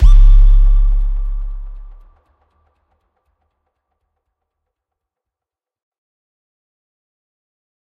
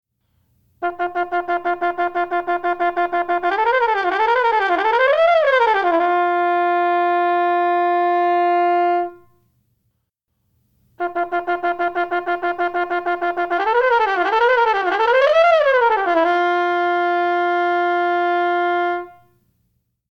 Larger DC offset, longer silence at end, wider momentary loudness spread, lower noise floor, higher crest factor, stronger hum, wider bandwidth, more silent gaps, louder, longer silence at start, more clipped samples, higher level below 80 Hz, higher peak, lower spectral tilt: neither; first, 6.15 s vs 1 s; first, 21 LU vs 7 LU; first, -88 dBFS vs -72 dBFS; about the same, 14 dB vs 16 dB; neither; second, 3.6 kHz vs 6.6 kHz; neither; about the same, -16 LUFS vs -18 LUFS; second, 0 s vs 0.8 s; neither; first, -14 dBFS vs -60 dBFS; about the same, 0 dBFS vs -2 dBFS; first, -7 dB/octave vs -4 dB/octave